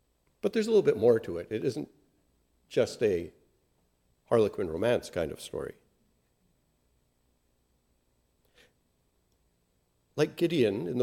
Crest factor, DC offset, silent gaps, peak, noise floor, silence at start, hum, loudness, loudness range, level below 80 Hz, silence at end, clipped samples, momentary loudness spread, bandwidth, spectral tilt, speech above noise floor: 20 dB; under 0.1%; none; -12 dBFS; -73 dBFS; 0.45 s; none; -29 LUFS; 13 LU; -66 dBFS; 0 s; under 0.1%; 14 LU; 16 kHz; -6 dB/octave; 45 dB